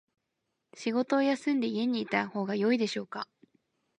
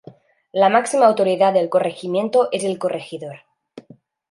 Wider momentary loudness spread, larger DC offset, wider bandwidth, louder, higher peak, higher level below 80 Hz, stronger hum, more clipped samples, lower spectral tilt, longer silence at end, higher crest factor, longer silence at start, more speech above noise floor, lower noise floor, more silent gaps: about the same, 11 LU vs 13 LU; neither; about the same, 10.5 kHz vs 11.5 kHz; second, -30 LUFS vs -18 LUFS; second, -12 dBFS vs -2 dBFS; second, -82 dBFS vs -72 dBFS; neither; neither; about the same, -5.5 dB/octave vs -4.5 dB/octave; first, 0.75 s vs 0.5 s; about the same, 20 dB vs 18 dB; first, 0.75 s vs 0.55 s; first, 53 dB vs 31 dB; first, -83 dBFS vs -49 dBFS; neither